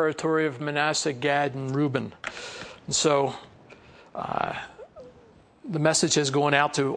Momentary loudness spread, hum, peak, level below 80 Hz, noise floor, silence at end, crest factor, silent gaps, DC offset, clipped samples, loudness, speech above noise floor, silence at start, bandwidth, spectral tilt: 18 LU; none; -4 dBFS; -64 dBFS; -54 dBFS; 0 s; 22 dB; none; under 0.1%; under 0.1%; -25 LUFS; 29 dB; 0 s; 10.5 kHz; -3.5 dB/octave